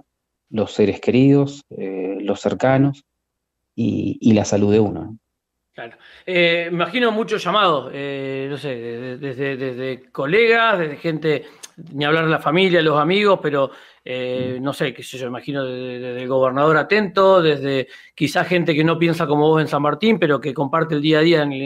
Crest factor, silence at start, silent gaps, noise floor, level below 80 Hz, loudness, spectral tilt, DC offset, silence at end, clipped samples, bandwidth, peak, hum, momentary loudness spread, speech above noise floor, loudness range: 14 dB; 0.5 s; none; -77 dBFS; -60 dBFS; -18 LUFS; -6 dB/octave; under 0.1%; 0 s; under 0.1%; 15 kHz; -4 dBFS; none; 14 LU; 59 dB; 4 LU